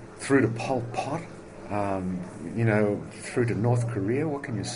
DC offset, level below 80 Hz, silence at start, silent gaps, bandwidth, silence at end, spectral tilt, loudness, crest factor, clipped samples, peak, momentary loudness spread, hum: under 0.1%; -56 dBFS; 0 s; none; 10.5 kHz; 0 s; -6.5 dB/octave; -28 LUFS; 18 dB; under 0.1%; -8 dBFS; 11 LU; none